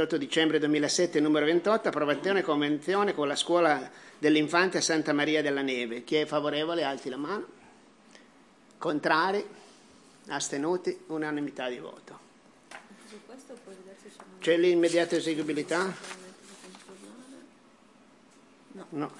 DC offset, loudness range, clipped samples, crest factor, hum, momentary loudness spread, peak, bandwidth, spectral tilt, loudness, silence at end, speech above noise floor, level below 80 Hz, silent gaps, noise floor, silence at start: under 0.1%; 10 LU; under 0.1%; 22 dB; none; 24 LU; -8 dBFS; 12 kHz; -4 dB/octave; -28 LUFS; 0 s; 30 dB; -82 dBFS; none; -58 dBFS; 0 s